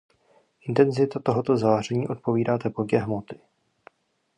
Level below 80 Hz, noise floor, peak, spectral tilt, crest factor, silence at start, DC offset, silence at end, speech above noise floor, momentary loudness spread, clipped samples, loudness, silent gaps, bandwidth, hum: -62 dBFS; -63 dBFS; -6 dBFS; -7.5 dB/octave; 20 dB; 0.65 s; under 0.1%; 1 s; 39 dB; 11 LU; under 0.1%; -24 LUFS; none; 10.5 kHz; none